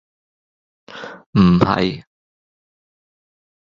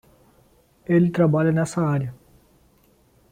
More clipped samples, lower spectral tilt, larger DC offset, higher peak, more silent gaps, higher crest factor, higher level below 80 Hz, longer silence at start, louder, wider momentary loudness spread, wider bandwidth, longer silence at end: neither; about the same, -8 dB/octave vs -8 dB/octave; neither; first, -2 dBFS vs -8 dBFS; first, 1.26-1.33 s vs none; about the same, 20 dB vs 16 dB; first, -44 dBFS vs -58 dBFS; about the same, 0.9 s vs 0.9 s; first, -16 LUFS vs -21 LUFS; first, 21 LU vs 12 LU; second, 7.2 kHz vs 10.5 kHz; first, 1.7 s vs 1.2 s